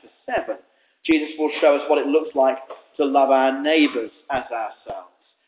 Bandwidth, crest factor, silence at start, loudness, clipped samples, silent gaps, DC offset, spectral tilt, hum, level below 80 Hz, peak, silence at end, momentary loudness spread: 4 kHz; 16 dB; 0.3 s; -20 LUFS; under 0.1%; none; under 0.1%; -7.5 dB/octave; none; -60 dBFS; -6 dBFS; 0.45 s; 16 LU